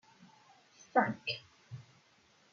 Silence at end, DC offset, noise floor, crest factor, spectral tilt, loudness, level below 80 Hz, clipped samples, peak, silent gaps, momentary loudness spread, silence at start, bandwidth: 0.7 s; under 0.1%; -67 dBFS; 26 dB; -2.5 dB/octave; -34 LUFS; -84 dBFS; under 0.1%; -14 dBFS; none; 21 LU; 0.2 s; 7.4 kHz